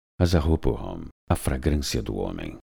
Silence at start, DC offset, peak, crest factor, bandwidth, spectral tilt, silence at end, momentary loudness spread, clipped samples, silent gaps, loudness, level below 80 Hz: 0.2 s; under 0.1%; -6 dBFS; 20 dB; over 20 kHz; -6 dB/octave; 0.15 s; 12 LU; under 0.1%; 1.11-1.27 s; -26 LUFS; -34 dBFS